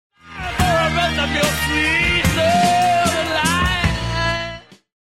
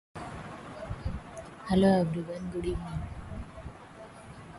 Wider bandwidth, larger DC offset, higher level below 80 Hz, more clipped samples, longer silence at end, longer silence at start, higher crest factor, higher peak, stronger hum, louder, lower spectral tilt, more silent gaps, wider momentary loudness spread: first, 16.5 kHz vs 11.5 kHz; first, 0.4% vs under 0.1%; first, -30 dBFS vs -46 dBFS; neither; first, 0.3 s vs 0 s; about the same, 0.25 s vs 0.15 s; about the same, 16 dB vs 18 dB; first, -2 dBFS vs -14 dBFS; neither; first, -17 LUFS vs -32 LUFS; second, -4 dB/octave vs -7.5 dB/octave; neither; second, 10 LU vs 23 LU